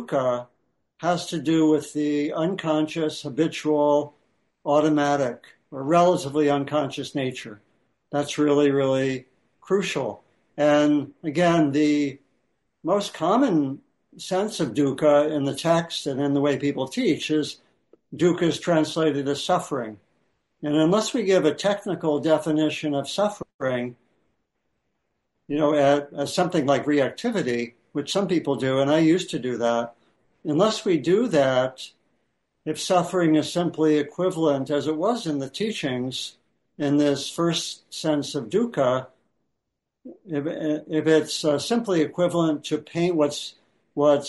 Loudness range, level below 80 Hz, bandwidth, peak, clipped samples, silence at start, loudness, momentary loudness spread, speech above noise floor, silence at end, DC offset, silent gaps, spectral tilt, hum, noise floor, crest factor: 3 LU; -66 dBFS; 11.5 kHz; -6 dBFS; under 0.1%; 0 s; -23 LUFS; 10 LU; 59 dB; 0 s; under 0.1%; 23.54-23.59 s; -5.5 dB/octave; none; -81 dBFS; 18 dB